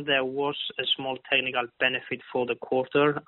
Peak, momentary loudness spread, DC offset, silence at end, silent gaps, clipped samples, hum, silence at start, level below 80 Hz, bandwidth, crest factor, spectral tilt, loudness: -8 dBFS; 6 LU; under 0.1%; 0.05 s; none; under 0.1%; none; 0 s; -70 dBFS; 4.2 kHz; 18 dB; -1.5 dB/octave; -27 LUFS